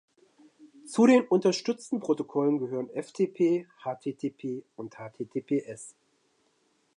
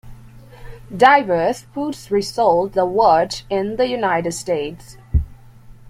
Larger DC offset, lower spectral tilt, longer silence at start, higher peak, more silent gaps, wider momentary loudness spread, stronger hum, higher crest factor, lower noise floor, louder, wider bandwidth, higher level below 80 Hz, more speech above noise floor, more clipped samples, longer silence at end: neither; about the same, -6 dB/octave vs -5 dB/octave; first, 0.65 s vs 0.05 s; second, -10 dBFS vs -2 dBFS; neither; first, 20 LU vs 13 LU; neither; about the same, 20 dB vs 18 dB; first, -70 dBFS vs -42 dBFS; second, -28 LUFS vs -18 LUFS; second, 11 kHz vs 15.5 kHz; second, -82 dBFS vs -34 dBFS; first, 43 dB vs 24 dB; neither; first, 1.05 s vs 0 s